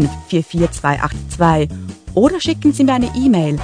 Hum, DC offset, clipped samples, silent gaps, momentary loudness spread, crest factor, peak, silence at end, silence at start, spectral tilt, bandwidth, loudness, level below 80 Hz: none; under 0.1%; under 0.1%; none; 7 LU; 16 dB; 0 dBFS; 0 s; 0 s; -6.5 dB/octave; 10.5 kHz; -16 LUFS; -32 dBFS